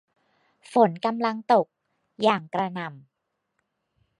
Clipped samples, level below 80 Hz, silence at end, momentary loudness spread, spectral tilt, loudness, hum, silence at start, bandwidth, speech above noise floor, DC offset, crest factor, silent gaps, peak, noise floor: under 0.1%; -78 dBFS; 1.2 s; 13 LU; -6.5 dB/octave; -24 LUFS; none; 0.7 s; 11.5 kHz; 54 dB; under 0.1%; 22 dB; none; -4 dBFS; -77 dBFS